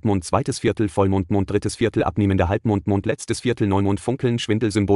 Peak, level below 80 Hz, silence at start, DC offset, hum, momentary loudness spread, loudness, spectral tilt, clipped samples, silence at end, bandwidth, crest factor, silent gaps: -4 dBFS; -46 dBFS; 0.05 s; under 0.1%; none; 3 LU; -21 LUFS; -6.5 dB/octave; under 0.1%; 0 s; 11.5 kHz; 16 dB; none